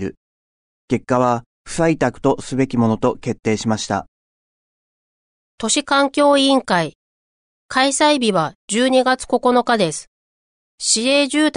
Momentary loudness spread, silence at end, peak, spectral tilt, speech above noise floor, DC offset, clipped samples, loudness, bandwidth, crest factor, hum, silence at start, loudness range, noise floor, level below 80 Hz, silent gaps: 9 LU; 0.05 s; -4 dBFS; -4 dB/octave; over 73 dB; under 0.1%; under 0.1%; -17 LUFS; 11 kHz; 16 dB; none; 0 s; 5 LU; under -90 dBFS; -50 dBFS; 0.17-0.88 s, 1.46-1.65 s, 4.08-5.58 s, 6.95-7.69 s, 8.55-8.68 s, 10.07-10.78 s